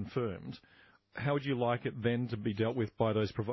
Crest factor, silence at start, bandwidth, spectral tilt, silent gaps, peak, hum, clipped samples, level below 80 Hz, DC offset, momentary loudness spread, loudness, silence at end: 18 dB; 0 s; 6 kHz; -6 dB/octave; none; -18 dBFS; none; under 0.1%; -60 dBFS; under 0.1%; 13 LU; -34 LUFS; 0 s